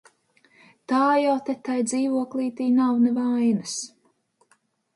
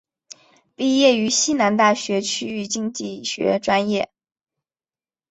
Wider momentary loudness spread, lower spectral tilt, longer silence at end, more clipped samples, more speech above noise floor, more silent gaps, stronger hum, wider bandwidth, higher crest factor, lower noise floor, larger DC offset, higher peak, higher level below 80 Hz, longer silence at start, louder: about the same, 8 LU vs 10 LU; first, -4.5 dB/octave vs -3 dB/octave; second, 1.1 s vs 1.25 s; neither; second, 44 dB vs over 70 dB; neither; neither; first, 11.5 kHz vs 8.4 kHz; about the same, 14 dB vs 18 dB; second, -66 dBFS vs under -90 dBFS; neither; second, -10 dBFS vs -2 dBFS; second, -76 dBFS vs -64 dBFS; about the same, 0.9 s vs 0.8 s; second, -23 LUFS vs -20 LUFS